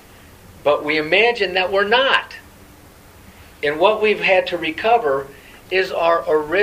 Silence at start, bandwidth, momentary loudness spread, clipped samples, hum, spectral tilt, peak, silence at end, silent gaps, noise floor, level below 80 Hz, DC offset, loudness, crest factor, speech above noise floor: 0.65 s; 15.5 kHz; 9 LU; under 0.1%; none; -4 dB/octave; 0 dBFS; 0 s; none; -45 dBFS; -52 dBFS; under 0.1%; -17 LUFS; 18 dB; 27 dB